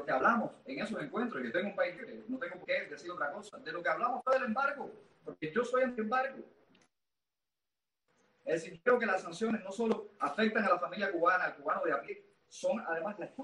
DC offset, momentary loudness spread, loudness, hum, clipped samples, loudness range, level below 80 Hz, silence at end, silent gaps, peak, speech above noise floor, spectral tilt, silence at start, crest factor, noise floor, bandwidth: under 0.1%; 13 LU; -34 LUFS; none; under 0.1%; 6 LU; -78 dBFS; 0 s; none; -16 dBFS; over 56 dB; -5 dB/octave; 0 s; 20 dB; under -90 dBFS; 11 kHz